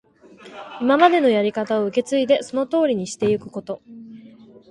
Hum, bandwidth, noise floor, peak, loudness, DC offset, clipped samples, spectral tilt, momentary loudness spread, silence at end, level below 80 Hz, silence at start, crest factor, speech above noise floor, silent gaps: none; 11.5 kHz; -46 dBFS; -2 dBFS; -19 LUFS; under 0.1%; under 0.1%; -5 dB/octave; 23 LU; 0.5 s; -64 dBFS; 0.45 s; 20 dB; 26 dB; none